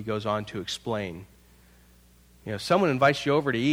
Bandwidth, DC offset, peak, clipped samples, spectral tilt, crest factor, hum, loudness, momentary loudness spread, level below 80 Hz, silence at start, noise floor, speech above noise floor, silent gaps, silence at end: 17 kHz; under 0.1%; -6 dBFS; under 0.1%; -5.5 dB/octave; 22 dB; none; -26 LUFS; 15 LU; -58 dBFS; 0 s; -56 dBFS; 31 dB; none; 0 s